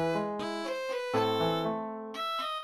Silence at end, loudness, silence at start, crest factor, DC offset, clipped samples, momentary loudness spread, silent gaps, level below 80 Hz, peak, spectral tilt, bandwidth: 0 s; -32 LUFS; 0 s; 16 dB; under 0.1%; under 0.1%; 7 LU; none; -68 dBFS; -16 dBFS; -5.5 dB/octave; 14.5 kHz